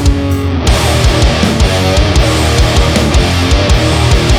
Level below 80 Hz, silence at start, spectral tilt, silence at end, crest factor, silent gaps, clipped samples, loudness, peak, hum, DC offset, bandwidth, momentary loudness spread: -14 dBFS; 0 s; -5 dB/octave; 0 s; 8 dB; none; under 0.1%; -10 LUFS; 0 dBFS; none; under 0.1%; 16 kHz; 2 LU